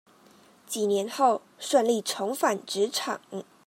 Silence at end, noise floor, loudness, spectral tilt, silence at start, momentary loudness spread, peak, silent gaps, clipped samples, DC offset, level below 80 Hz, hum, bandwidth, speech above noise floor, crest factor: 0.25 s; -57 dBFS; -27 LUFS; -3 dB/octave; 0.7 s; 10 LU; -8 dBFS; none; under 0.1%; under 0.1%; -88 dBFS; none; 16 kHz; 30 dB; 20 dB